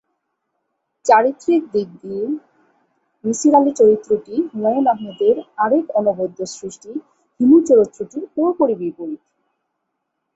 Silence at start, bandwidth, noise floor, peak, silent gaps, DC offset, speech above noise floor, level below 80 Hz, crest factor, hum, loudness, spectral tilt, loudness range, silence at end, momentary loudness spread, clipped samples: 1.05 s; 8.2 kHz; -75 dBFS; -2 dBFS; none; under 0.1%; 58 dB; -62 dBFS; 18 dB; none; -17 LUFS; -5.5 dB/octave; 3 LU; 1.2 s; 16 LU; under 0.1%